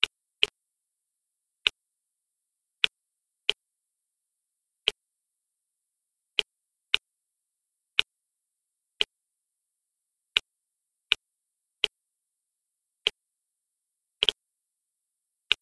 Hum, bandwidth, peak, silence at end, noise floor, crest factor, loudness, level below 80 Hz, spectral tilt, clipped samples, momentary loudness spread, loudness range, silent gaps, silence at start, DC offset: none; 11 kHz; 0 dBFS; 0.05 s; -84 dBFS; 34 dB; -29 LUFS; -70 dBFS; 1 dB/octave; under 0.1%; 4 LU; 3 LU; none; 0 s; under 0.1%